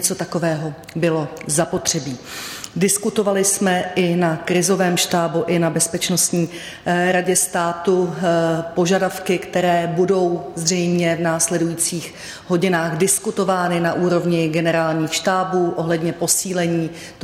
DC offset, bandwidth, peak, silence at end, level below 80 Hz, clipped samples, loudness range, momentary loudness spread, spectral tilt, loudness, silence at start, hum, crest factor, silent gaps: under 0.1%; 16 kHz; -4 dBFS; 0 s; -56 dBFS; under 0.1%; 1 LU; 6 LU; -4 dB/octave; -19 LUFS; 0 s; none; 14 dB; none